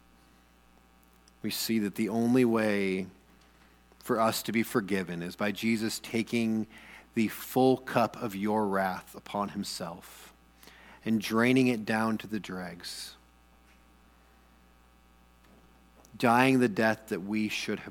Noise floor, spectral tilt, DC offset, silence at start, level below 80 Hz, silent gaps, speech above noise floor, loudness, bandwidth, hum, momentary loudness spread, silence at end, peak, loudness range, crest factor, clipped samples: -61 dBFS; -5 dB/octave; under 0.1%; 1.45 s; -64 dBFS; none; 32 dB; -29 LUFS; 19 kHz; 60 Hz at -60 dBFS; 15 LU; 0 s; -8 dBFS; 5 LU; 24 dB; under 0.1%